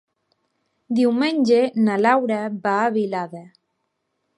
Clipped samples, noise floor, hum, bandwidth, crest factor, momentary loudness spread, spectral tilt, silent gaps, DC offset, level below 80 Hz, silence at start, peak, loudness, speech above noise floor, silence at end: under 0.1%; -74 dBFS; none; 11 kHz; 18 dB; 9 LU; -6 dB/octave; none; under 0.1%; -74 dBFS; 0.9 s; -4 dBFS; -20 LUFS; 55 dB; 0.95 s